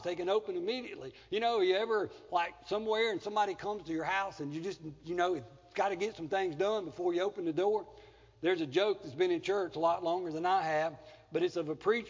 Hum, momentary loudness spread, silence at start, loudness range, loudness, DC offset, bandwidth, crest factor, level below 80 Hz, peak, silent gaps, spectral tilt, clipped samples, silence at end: none; 9 LU; 0 s; 2 LU; -34 LUFS; under 0.1%; 7.6 kHz; 16 dB; -70 dBFS; -16 dBFS; none; -5 dB/octave; under 0.1%; 0 s